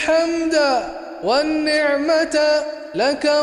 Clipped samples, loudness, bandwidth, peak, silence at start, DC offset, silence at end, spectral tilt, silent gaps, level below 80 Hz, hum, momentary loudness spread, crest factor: under 0.1%; -18 LUFS; 11.5 kHz; -6 dBFS; 0 s; under 0.1%; 0 s; -3 dB/octave; none; -52 dBFS; none; 6 LU; 12 dB